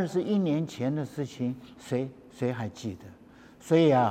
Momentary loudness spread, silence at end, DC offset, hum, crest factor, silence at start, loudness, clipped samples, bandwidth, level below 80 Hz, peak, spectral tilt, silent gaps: 16 LU; 0 s; under 0.1%; none; 18 dB; 0 s; -29 LUFS; under 0.1%; 15 kHz; -68 dBFS; -10 dBFS; -7 dB/octave; none